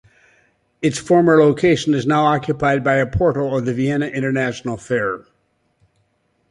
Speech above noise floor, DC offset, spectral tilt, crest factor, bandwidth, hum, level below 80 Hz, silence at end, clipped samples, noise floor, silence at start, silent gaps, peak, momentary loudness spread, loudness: 48 dB; under 0.1%; -6.5 dB/octave; 18 dB; 11.5 kHz; none; -44 dBFS; 1.3 s; under 0.1%; -65 dBFS; 0.8 s; none; -2 dBFS; 9 LU; -17 LUFS